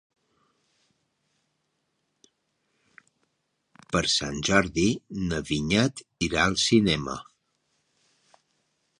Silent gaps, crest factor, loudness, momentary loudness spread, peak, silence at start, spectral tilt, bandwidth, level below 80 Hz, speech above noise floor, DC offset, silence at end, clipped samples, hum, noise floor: none; 26 dB; -25 LUFS; 9 LU; -4 dBFS; 3.9 s; -4 dB/octave; 11 kHz; -50 dBFS; 51 dB; under 0.1%; 1.75 s; under 0.1%; none; -76 dBFS